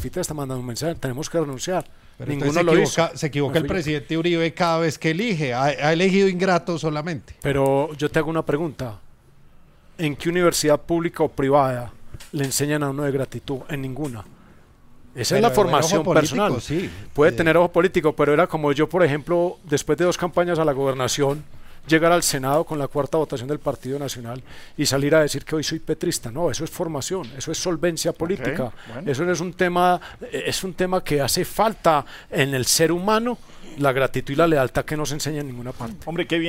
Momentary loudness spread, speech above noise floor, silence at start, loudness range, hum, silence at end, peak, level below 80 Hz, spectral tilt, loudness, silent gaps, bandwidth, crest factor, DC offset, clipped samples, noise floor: 11 LU; 28 dB; 0 s; 5 LU; none; 0 s; -2 dBFS; -46 dBFS; -4.5 dB/octave; -22 LUFS; none; 16 kHz; 18 dB; under 0.1%; under 0.1%; -49 dBFS